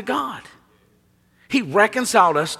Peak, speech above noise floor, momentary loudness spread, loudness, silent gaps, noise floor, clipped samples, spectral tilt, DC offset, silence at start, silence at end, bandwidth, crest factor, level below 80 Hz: -2 dBFS; 40 dB; 13 LU; -19 LUFS; none; -60 dBFS; under 0.1%; -3.5 dB/octave; under 0.1%; 0 s; 0 s; 16 kHz; 20 dB; -64 dBFS